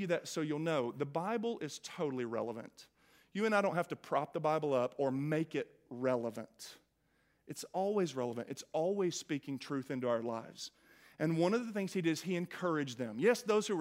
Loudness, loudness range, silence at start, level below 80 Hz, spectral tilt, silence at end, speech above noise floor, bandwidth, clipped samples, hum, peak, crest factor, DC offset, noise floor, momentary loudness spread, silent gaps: -36 LUFS; 4 LU; 0 s; -82 dBFS; -5.5 dB/octave; 0 s; 40 dB; 16 kHz; under 0.1%; none; -18 dBFS; 20 dB; under 0.1%; -76 dBFS; 12 LU; none